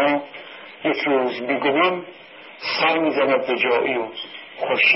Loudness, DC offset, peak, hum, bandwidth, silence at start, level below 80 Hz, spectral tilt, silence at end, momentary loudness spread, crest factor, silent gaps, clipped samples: -21 LUFS; under 0.1%; -6 dBFS; none; 5.8 kHz; 0 s; -68 dBFS; -8 dB/octave; 0 s; 18 LU; 16 dB; none; under 0.1%